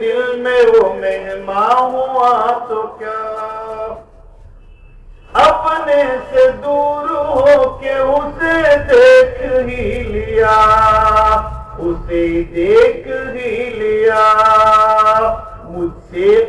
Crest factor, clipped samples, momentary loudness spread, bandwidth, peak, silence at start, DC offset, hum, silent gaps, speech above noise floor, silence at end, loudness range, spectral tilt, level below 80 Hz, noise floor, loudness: 12 dB; under 0.1%; 14 LU; 11 kHz; 0 dBFS; 0 s; under 0.1%; none; none; 27 dB; 0 s; 6 LU; -5.5 dB/octave; -32 dBFS; -39 dBFS; -13 LUFS